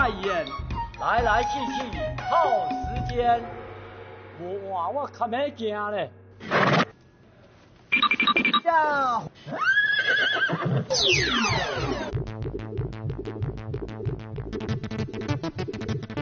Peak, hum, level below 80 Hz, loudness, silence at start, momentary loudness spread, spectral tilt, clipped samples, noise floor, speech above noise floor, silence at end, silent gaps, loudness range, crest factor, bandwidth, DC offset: -10 dBFS; none; -44 dBFS; -25 LUFS; 0 s; 14 LU; -2.5 dB/octave; under 0.1%; -54 dBFS; 29 dB; 0 s; none; 10 LU; 16 dB; 7.2 kHz; under 0.1%